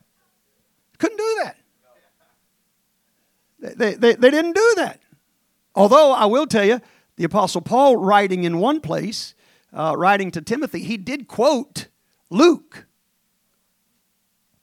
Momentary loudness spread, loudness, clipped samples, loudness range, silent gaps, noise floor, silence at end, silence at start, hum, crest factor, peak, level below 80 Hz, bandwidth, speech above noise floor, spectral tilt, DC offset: 14 LU; -18 LUFS; under 0.1%; 8 LU; none; -68 dBFS; 1.85 s; 1 s; none; 20 dB; 0 dBFS; -64 dBFS; 16 kHz; 51 dB; -5 dB/octave; under 0.1%